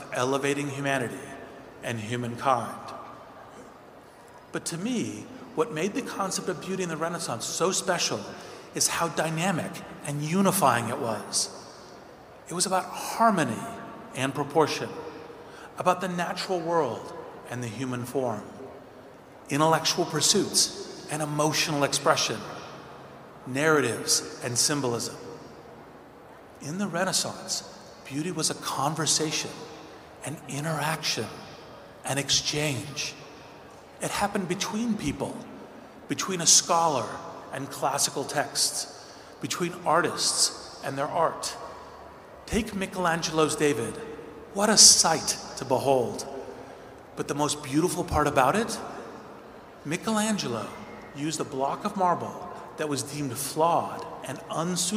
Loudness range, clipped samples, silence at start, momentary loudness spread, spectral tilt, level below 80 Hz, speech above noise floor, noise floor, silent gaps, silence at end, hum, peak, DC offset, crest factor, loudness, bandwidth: 10 LU; under 0.1%; 0 s; 21 LU; -2.5 dB/octave; -58 dBFS; 23 dB; -49 dBFS; none; 0 s; none; 0 dBFS; under 0.1%; 28 dB; -26 LUFS; 16 kHz